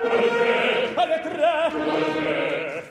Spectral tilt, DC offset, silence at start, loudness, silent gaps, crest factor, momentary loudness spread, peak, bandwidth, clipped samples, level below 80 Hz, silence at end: -4.5 dB/octave; under 0.1%; 0 s; -22 LUFS; none; 12 dB; 4 LU; -10 dBFS; 11 kHz; under 0.1%; -62 dBFS; 0 s